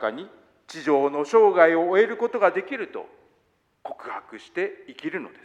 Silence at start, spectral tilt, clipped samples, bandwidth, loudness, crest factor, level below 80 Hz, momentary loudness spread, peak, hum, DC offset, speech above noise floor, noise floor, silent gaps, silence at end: 0 s; -5 dB/octave; under 0.1%; 8.6 kHz; -22 LUFS; 20 dB; -76 dBFS; 21 LU; -4 dBFS; none; under 0.1%; 44 dB; -67 dBFS; none; 0.15 s